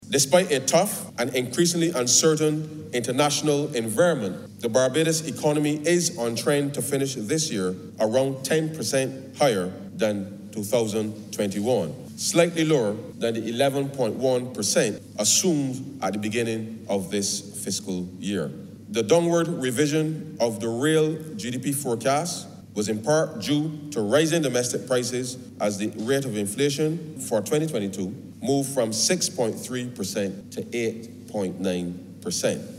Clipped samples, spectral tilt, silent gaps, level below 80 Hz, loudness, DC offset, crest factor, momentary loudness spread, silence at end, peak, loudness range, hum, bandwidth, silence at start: under 0.1%; -4 dB/octave; none; -68 dBFS; -24 LUFS; under 0.1%; 20 dB; 10 LU; 0 s; -4 dBFS; 4 LU; none; 16 kHz; 0 s